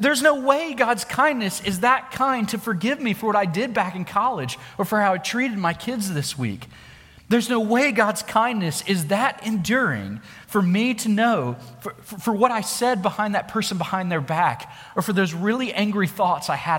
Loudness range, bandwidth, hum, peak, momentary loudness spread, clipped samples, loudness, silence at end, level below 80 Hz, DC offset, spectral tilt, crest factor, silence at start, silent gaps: 2 LU; 17 kHz; none; -2 dBFS; 9 LU; under 0.1%; -22 LUFS; 0 s; -58 dBFS; under 0.1%; -4.5 dB/octave; 20 dB; 0 s; none